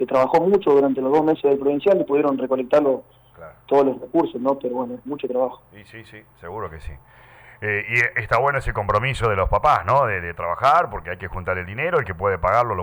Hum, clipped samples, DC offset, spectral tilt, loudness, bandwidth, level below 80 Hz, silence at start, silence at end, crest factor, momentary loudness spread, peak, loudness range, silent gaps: none; under 0.1%; under 0.1%; -7 dB/octave; -20 LUFS; over 20 kHz; -40 dBFS; 0 s; 0 s; 14 dB; 13 LU; -6 dBFS; 7 LU; none